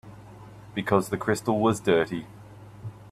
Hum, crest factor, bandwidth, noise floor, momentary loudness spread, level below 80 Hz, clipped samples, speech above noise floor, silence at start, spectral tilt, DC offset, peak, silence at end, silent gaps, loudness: none; 22 dB; 14.5 kHz; -46 dBFS; 23 LU; -58 dBFS; under 0.1%; 21 dB; 0.05 s; -6 dB/octave; under 0.1%; -6 dBFS; 0 s; none; -26 LUFS